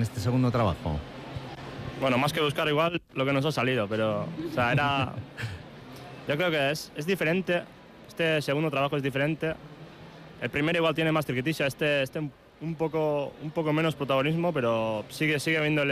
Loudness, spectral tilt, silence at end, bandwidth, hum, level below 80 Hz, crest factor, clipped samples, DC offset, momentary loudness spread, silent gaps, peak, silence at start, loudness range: -27 LUFS; -6 dB/octave; 0 s; 15.5 kHz; none; -54 dBFS; 14 dB; under 0.1%; under 0.1%; 14 LU; none; -14 dBFS; 0 s; 2 LU